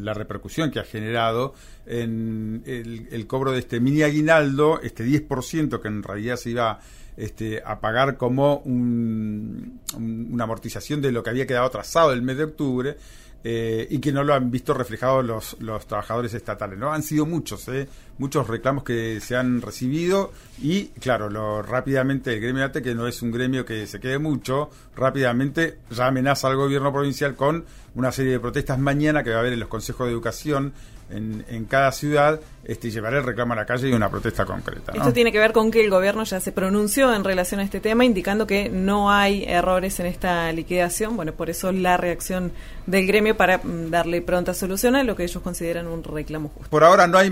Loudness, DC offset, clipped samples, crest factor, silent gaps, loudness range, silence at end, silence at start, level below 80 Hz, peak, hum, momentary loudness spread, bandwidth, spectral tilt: -23 LUFS; under 0.1%; under 0.1%; 20 dB; none; 5 LU; 0 s; 0 s; -42 dBFS; -2 dBFS; none; 12 LU; 16 kHz; -5.5 dB/octave